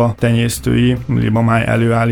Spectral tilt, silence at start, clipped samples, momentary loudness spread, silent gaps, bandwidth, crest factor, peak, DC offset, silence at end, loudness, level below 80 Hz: -6.5 dB/octave; 0 s; under 0.1%; 2 LU; none; 18 kHz; 12 dB; -2 dBFS; under 0.1%; 0 s; -15 LUFS; -34 dBFS